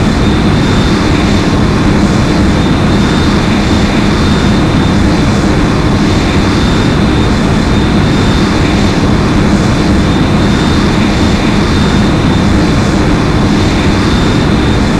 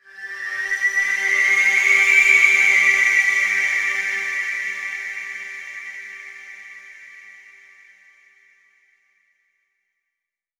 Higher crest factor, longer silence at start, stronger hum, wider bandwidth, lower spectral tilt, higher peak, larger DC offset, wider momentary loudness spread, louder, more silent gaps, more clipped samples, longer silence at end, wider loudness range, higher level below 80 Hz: second, 8 dB vs 20 dB; second, 0 s vs 0.15 s; neither; second, 13 kHz vs 18 kHz; first, -6 dB/octave vs 1.5 dB/octave; about the same, 0 dBFS vs -2 dBFS; first, 0.5% vs under 0.1%; second, 1 LU vs 22 LU; first, -9 LUFS vs -16 LUFS; neither; neither; second, 0 s vs 3.3 s; second, 0 LU vs 21 LU; first, -16 dBFS vs -68 dBFS